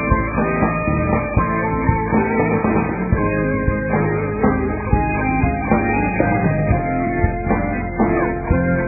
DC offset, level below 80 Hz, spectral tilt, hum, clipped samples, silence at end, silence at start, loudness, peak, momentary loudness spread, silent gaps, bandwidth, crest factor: under 0.1%; -28 dBFS; -15.5 dB/octave; none; under 0.1%; 0 s; 0 s; -18 LUFS; -2 dBFS; 2 LU; none; 2.7 kHz; 16 dB